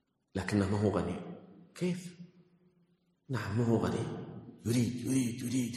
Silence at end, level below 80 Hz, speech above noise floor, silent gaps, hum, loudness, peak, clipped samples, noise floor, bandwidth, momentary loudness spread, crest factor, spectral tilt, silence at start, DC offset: 0 s; -62 dBFS; 40 dB; none; none; -34 LUFS; -16 dBFS; under 0.1%; -72 dBFS; 13 kHz; 17 LU; 18 dB; -6.5 dB/octave; 0.35 s; under 0.1%